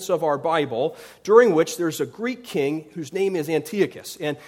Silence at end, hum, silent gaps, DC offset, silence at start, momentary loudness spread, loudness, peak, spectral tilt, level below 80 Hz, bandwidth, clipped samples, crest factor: 0 s; none; none; under 0.1%; 0 s; 14 LU; -22 LUFS; -2 dBFS; -5 dB/octave; -68 dBFS; 16.5 kHz; under 0.1%; 20 dB